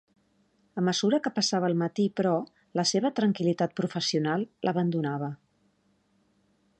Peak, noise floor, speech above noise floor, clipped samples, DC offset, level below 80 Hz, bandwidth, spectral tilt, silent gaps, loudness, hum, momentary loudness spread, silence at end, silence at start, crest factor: -14 dBFS; -69 dBFS; 42 dB; under 0.1%; under 0.1%; -74 dBFS; 9.6 kHz; -5 dB/octave; none; -28 LUFS; none; 7 LU; 1.45 s; 0.75 s; 16 dB